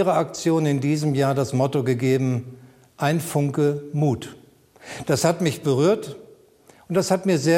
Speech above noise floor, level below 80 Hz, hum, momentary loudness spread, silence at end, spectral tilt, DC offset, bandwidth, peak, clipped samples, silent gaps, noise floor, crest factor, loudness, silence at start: 32 dB; -62 dBFS; none; 10 LU; 0 s; -6 dB/octave; under 0.1%; 16 kHz; -4 dBFS; under 0.1%; none; -53 dBFS; 18 dB; -22 LUFS; 0 s